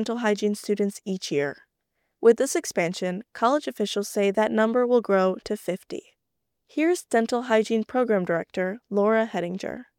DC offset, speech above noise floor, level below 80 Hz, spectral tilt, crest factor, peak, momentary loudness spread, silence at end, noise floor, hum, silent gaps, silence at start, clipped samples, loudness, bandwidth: under 0.1%; 58 dB; -68 dBFS; -5 dB/octave; 18 dB; -6 dBFS; 10 LU; 0.15 s; -82 dBFS; none; none; 0 s; under 0.1%; -25 LUFS; 17.5 kHz